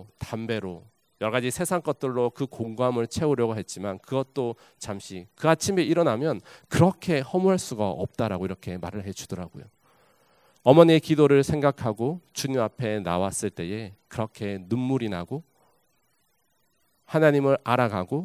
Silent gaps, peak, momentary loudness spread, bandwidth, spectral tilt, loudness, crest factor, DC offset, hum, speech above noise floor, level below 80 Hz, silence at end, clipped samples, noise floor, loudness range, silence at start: none; 0 dBFS; 16 LU; 16 kHz; -6 dB/octave; -25 LUFS; 26 dB; under 0.1%; none; 46 dB; -54 dBFS; 0 s; under 0.1%; -71 dBFS; 8 LU; 0 s